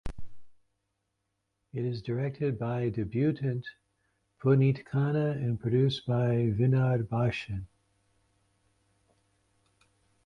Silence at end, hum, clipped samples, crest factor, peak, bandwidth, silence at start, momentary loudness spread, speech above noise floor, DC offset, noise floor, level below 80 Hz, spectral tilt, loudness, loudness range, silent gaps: 2.6 s; none; under 0.1%; 18 dB; -12 dBFS; 6.2 kHz; 0.05 s; 11 LU; 53 dB; under 0.1%; -81 dBFS; -54 dBFS; -9 dB/octave; -29 LUFS; 7 LU; none